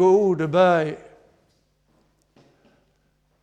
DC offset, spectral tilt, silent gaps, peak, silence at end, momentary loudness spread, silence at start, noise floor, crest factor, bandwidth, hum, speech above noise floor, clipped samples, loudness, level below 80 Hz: under 0.1%; -7 dB/octave; none; -6 dBFS; 2.45 s; 13 LU; 0 s; -66 dBFS; 18 dB; 8.4 kHz; 50 Hz at -60 dBFS; 48 dB; under 0.1%; -19 LUFS; -66 dBFS